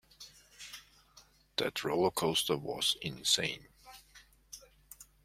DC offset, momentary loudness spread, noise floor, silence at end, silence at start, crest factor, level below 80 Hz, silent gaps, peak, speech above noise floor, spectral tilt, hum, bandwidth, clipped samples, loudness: under 0.1%; 24 LU; -63 dBFS; 0.2 s; 0.2 s; 24 dB; -66 dBFS; none; -14 dBFS; 30 dB; -2.5 dB/octave; none; 16.5 kHz; under 0.1%; -32 LUFS